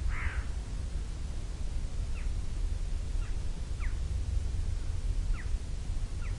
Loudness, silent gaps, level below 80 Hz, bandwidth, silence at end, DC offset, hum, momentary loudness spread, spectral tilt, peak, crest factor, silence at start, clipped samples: -38 LUFS; none; -34 dBFS; 11 kHz; 0 s; under 0.1%; none; 4 LU; -5.5 dB/octave; -18 dBFS; 14 dB; 0 s; under 0.1%